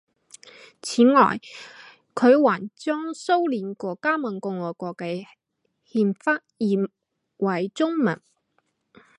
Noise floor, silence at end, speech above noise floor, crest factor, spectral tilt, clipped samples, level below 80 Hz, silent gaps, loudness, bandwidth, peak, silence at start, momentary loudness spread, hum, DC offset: -73 dBFS; 1.05 s; 51 dB; 20 dB; -6 dB/octave; under 0.1%; -74 dBFS; none; -23 LUFS; 11.5 kHz; -4 dBFS; 0.85 s; 16 LU; none; under 0.1%